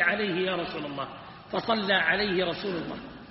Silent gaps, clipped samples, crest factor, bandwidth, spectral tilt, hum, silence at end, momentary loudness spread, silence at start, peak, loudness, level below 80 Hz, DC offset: none; under 0.1%; 20 dB; 5.8 kHz; -2 dB/octave; none; 0 s; 15 LU; 0 s; -10 dBFS; -28 LUFS; -58 dBFS; under 0.1%